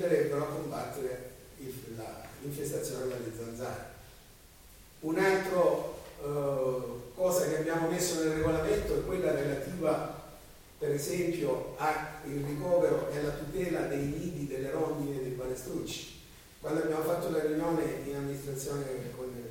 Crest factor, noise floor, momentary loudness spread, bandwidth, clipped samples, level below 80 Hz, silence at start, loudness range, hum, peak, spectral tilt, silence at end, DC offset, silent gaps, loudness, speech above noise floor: 18 dB; -55 dBFS; 14 LU; 17 kHz; under 0.1%; -54 dBFS; 0 s; 8 LU; none; -14 dBFS; -5.5 dB/octave; 0 s; under 0.1%; none; -33 LUFS; 23 dB